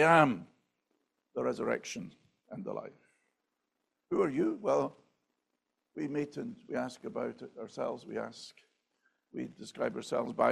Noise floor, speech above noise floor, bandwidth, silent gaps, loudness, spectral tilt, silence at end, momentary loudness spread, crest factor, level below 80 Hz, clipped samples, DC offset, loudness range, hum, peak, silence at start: -84 dBFS; 51 dB; 13 kHz; none; -35 LUFS; -5.5 dB/octave; 0 s; 16 LU; 26 dB; -76 dBFS; under 0.1%; under 0.1%; 5 LU; none; -8 dBFS; 0 s